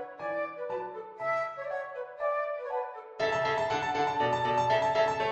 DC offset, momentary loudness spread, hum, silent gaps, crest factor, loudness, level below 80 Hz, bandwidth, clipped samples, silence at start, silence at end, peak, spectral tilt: under 0.1%; 10 LU; none; none; 16 dB; -31 LUFS; -64 dBFS; 9.2 kHz; under 0.1%; 0 s; 0 s; -14 dBFS; -4.5 dB/octave